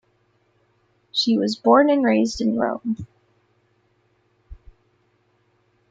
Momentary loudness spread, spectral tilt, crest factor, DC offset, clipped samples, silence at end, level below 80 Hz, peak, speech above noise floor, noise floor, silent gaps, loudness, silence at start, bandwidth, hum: 13 LU; -5 dB/octave; 20 dB; under 0.1%; under 0.1%; 1.35 s; -52 dBFS; -2 dBFS; 46 dB; -65 dBFS; none; -20 LUFS; 1.15 s; 7.8 kHz; none